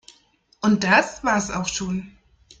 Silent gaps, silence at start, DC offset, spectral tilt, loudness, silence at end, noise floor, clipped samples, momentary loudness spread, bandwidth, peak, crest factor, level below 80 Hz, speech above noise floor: none; 0.6 s; under 0.1%; -4 dB/octave; -21 LUFS; 0.5 s; -60 dBFS; under 0.1%; 11 LU; 9.2 kHz; -4 dBFS; 20 dB; -50 dBFS; 39 dB